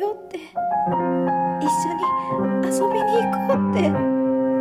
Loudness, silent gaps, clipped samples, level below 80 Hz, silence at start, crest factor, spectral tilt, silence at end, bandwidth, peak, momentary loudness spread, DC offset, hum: -21 LUFS; none; under 0.1%; -58 dBFS; 0 s; 12 dB; -6.5 dB/octave; 0 s; 16 kHz; -8 dBFS; 4 LU; under 0.1%; none